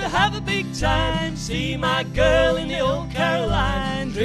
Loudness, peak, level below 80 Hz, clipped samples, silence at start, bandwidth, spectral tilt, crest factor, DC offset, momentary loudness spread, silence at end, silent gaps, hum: -21 LUFS; -6 dBFS; -32 dBFS; under 0.1%; 0 s; 13 kHz; -5 dB/octave; 16 dB; under 0.1%; 6 LU; 0 s; none; none